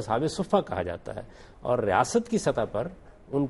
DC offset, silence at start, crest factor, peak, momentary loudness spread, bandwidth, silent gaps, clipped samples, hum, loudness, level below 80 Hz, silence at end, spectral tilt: under 0.1%; 0 s; 20 dB; -8 dBFS; 14 LU; 11.5 kHz; none; under 0.1%; none; -28 LUFS; -52 dBFS; 0 s; -5.5 dB/octave